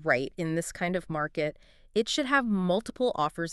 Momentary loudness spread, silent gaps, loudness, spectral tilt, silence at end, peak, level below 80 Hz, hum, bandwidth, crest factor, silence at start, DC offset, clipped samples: 7 LU; none; -29 LUFS; -4.5 dB/octave; 0 s; -10 dBFS; -56 dBFS; none; 13 kHz; 20 dB; 0 s; under 0.1%; under 0.1%